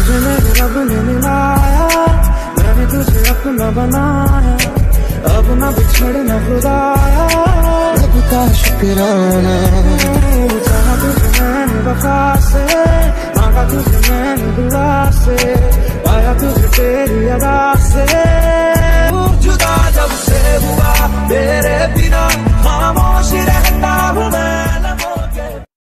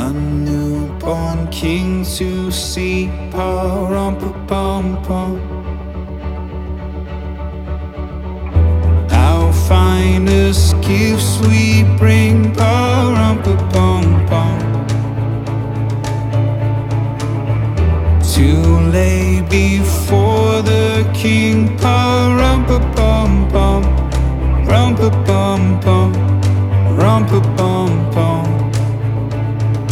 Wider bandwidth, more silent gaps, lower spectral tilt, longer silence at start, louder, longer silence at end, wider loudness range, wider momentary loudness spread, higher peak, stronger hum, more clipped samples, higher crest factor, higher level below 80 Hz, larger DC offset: about the same, 14.5 kHz vs 15 kHz; neither; about the same, -5.5 dB/octave vs -6.5 dB/octave; about the same, 0 s vs 0 s; about the same, -12 LUFS vs -14 LUFS; first, 0.25 s vs 0 s; second, 1 LU vs 8 LU; second, 3 LU vs 11 LU; about the same, 0 dBFS vs 0 dBFS; neither; neither; about the same, 10 dB vs 12 dB; first, -12 dBFS vs -20 dBFS; neither